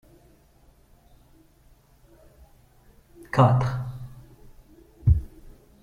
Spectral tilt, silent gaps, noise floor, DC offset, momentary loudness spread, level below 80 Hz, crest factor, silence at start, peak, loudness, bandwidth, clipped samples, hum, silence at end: -8.5 dB/octave; none; -57 dBFS; under 0.1%; 23 LU; -38 dBFS; 24 dB; 3.35 s; -6 dBFS; -24 LUFS; 7.6 kHz; under 0.1%; none; 0.35 s